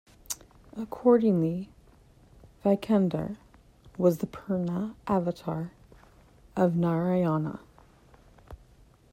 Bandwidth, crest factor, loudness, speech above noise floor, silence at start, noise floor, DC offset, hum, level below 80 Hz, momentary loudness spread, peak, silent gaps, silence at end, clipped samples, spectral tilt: 16 kHz; 18 dB; -28 LUFS; 31 dB; 0.3 s; -58 dBFS; under 0.1%; none; -58 dBFS; 17 LU; -10 dBFS; none; 0.6 s; under 0.1%; -7.5 dB/octave